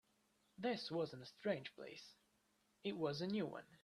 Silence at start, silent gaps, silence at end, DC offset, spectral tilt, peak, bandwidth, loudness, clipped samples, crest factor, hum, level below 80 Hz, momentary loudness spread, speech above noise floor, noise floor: 0.6 s; none; 0.05 s; under 0.1%; -6 dB/octave; -28 dBFS; 13 kHz; -45 LUFS; under 0.1%; 20 dB; none; -84 dBFS; 13 LU; 35 dB; -80 dBFS